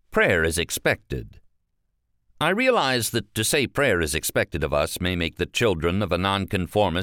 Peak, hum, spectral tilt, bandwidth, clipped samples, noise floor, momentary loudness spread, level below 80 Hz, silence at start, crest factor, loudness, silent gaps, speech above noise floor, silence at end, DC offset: -6 dBFS; none; -4 dB/octave; 17.5 kHz; under 0.1%; -72 dBFS; 6 LU; -42 dBFS; 0.1 s; 18 dB; -23 LUFS; none; 49 dB; 0 s; under 0.1%